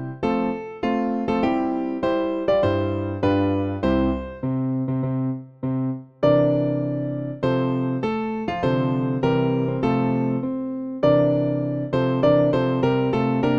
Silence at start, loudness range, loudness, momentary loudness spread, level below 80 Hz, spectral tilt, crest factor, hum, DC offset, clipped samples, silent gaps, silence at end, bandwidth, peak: 0 s; 2 LU; -22 LUFS; 8 LU; -44 dBFS; -9 dB/octave; 14 dB; none; 0.2%; under 0.1%; none; 0 s; 6.8 kHz; -6 dBFS